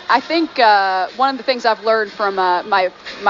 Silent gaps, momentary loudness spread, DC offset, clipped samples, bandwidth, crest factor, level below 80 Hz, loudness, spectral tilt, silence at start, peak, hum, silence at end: none; 6 LU; under 0.1%; under 0.1%; 7.4 kHz; 14 dB; -62 dBFS; -16 LUFS; 0 dB/octave; 0 s; -2 dBFS; none; 0 s